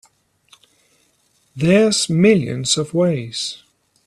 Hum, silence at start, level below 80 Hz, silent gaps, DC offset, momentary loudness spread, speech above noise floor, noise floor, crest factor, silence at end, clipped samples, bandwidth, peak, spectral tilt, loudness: none; 1.55 s; -56 dBFS; none; under 0.1%; 11 LU; 45 dB; -61 dBFS; 18 dB; 0.5 s; under 0.1%; 13 kHz; -2 dBFS; -4.5 dB/octave; -17 LUFS